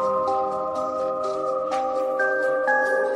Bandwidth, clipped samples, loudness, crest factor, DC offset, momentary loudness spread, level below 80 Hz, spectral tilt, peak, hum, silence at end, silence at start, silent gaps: 10.5 kHz; under 0.1%; -24 LUFS; 14 dB; under 0.1%; 5 LU; -62 dBFS; -4.5 dB/octave; -8 dBFS; none; 0 s; 0 s; none